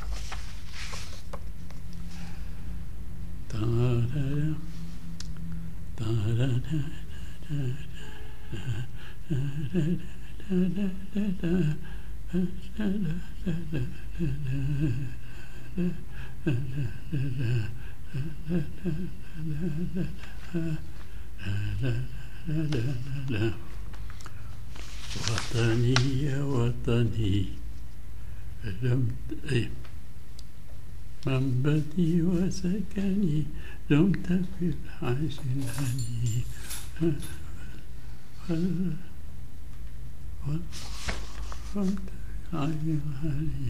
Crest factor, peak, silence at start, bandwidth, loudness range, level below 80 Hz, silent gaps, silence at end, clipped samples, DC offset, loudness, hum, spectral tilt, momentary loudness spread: 24 dB; -6 dBFS; 0 s; 15.5 kHz; 7 LU; -42 dBFS; none; 0 s; under 0.1%; 4%; -31 LUFS; none; -6.5 dB/octave; 17 LU